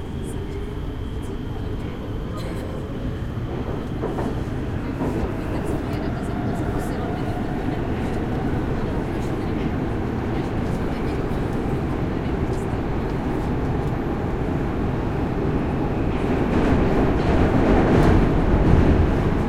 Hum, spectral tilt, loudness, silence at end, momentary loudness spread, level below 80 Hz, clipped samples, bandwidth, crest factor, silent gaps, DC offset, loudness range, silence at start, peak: none; -8 dB/octave; -24 LUFS; 0 s; 11 LU; -28 dBFS; under 0.1%; 14.5 kHz; 20 dB; none; under 0.1%; 9 LU; 0 s; -2 dBFS